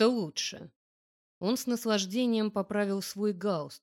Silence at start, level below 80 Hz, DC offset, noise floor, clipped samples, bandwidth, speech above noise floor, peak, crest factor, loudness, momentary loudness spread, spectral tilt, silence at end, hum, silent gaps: 0 s; -76 dBFS; under 0.1%; under -90 dBFS; under 0.1%; 17 kHz; over 60 dB; -14 dBFS; 18 dB; -31 LUFS; 6 LU; -4.5 dB/octave; 0.05 s; none; 0.76-1.41 s